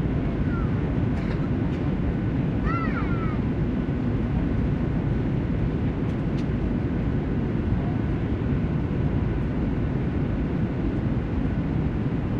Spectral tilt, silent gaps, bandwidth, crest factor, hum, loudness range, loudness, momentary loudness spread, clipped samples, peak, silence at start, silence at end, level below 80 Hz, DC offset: -10 dB/octave; none; 6.8 kHz; 12 dB; none; 1 LU; -26 LUFS; 1 LU; under 0.1%; -12 dBFS; 0 s; 0 s; -32 dBFS; under 0.1%